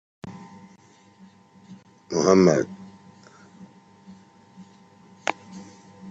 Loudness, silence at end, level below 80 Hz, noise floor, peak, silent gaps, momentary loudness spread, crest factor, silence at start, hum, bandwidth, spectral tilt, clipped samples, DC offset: -22 LUFS; 0 s; -68 dBFS; -54 dBFS; -4 dBFS; none; 29 LU; 24 dB; 0.25 s; none; 8 kHz; -5.5 dB/octave; under 0.1%; under 0.1%